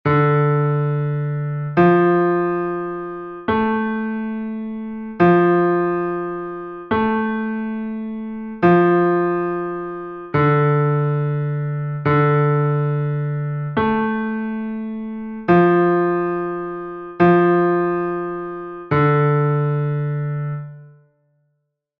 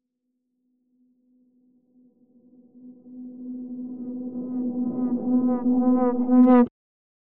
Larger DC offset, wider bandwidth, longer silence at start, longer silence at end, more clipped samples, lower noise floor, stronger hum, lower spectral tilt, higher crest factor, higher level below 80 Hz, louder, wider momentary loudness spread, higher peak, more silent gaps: neither; first, 4.7 kHz vs 2.9 kHz; second, 0.05 s vs 2.75 s; first, 1.1 s vs 0.55 s; neither; second, -72 dBFS vs -78 dBFS; neither; first, -11 dB/octave vs -8.5 dB/octave; about the same, 14 dB vs 18 dB; first, -52 dBFS vs -66 dBFS; first, -19 LUFS vs -22 LUFS; second, 14 LU vs 21 LU; first, -4 dBFS vs -8 dBFS; neither